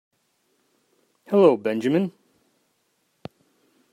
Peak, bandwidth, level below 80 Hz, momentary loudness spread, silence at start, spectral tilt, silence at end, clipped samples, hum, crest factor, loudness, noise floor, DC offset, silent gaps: -6 dBFS; 13 kHz; -74 dBFS; 27 LU; 1.3 s; -8 dB/octave; 1.85 s; under 0.1%; none; 20 dB; -21 LUFS; -70 dBFS; under 0.1%; none